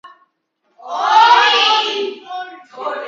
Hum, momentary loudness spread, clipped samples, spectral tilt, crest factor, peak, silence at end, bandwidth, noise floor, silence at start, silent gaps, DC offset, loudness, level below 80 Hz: none; 20 LU; under 0.1%; 1 dB/octave; 16 dB; 0 dBFS; 0 s; 7.6 kHz; -66 dBFS; 0.05 s; none; under 0.1%; -12 LUFS; -86 dBFS